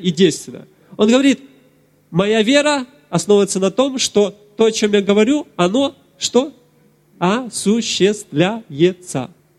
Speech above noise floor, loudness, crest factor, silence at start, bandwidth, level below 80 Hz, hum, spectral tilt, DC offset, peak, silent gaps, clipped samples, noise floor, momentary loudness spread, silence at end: 38 dB; -16 LUFS; 16 dB; 0 s; 13 kHz; -58 dBFS; none; -4.5 dB/octave; under 0.1%; -2 dBFS; none; under 0.1%; -54 dBFS; 9 LU; 0.3 s